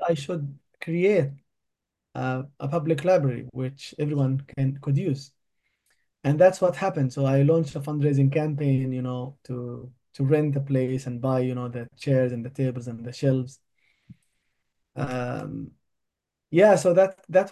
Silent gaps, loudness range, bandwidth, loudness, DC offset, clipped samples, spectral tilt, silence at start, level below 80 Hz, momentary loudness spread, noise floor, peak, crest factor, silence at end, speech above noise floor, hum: none; 7 LU; 12 kHz; -25 LUFS; under 0.1%; under 0.1%; -7.5 dB/octave; 0 s; -62 dBFS; 15 LU; -83 dBFS; -6 dBFS; 20 dB; 0 s; 59 dB; none